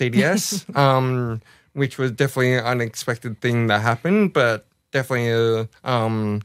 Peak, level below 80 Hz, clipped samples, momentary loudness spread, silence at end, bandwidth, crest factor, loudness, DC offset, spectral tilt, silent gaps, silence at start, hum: -4 dBFS; -60 dBFS; under 0.1%; 8 LU; 0 s; 16 kHz; 18 dB; -21 LUFS; under 0.1%; -5.5 dB/octave; none; 0 s; none